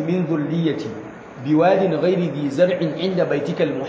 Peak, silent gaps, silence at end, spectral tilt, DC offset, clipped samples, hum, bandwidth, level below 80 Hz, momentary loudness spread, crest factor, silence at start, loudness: -4 dBFS; none; 0 s; -8 dB/octave; under 0.1%; under 0.1%; none; 8 kHz; -60 dBFS; 13 LU; 16 dB; 0 s; -20 LUFS